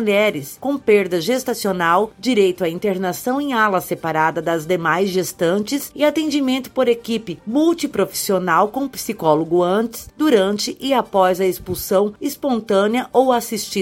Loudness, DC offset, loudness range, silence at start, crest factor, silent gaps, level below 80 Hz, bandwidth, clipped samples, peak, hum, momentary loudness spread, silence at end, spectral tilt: -19 LUFS; under 0.1%; 1 LU; 0 s; 16 dB; none; -54 dBFS; 17 kHz; under 0.1%; -2 dBFS; none; 6 LU; 0 s; -4.5 dB/octave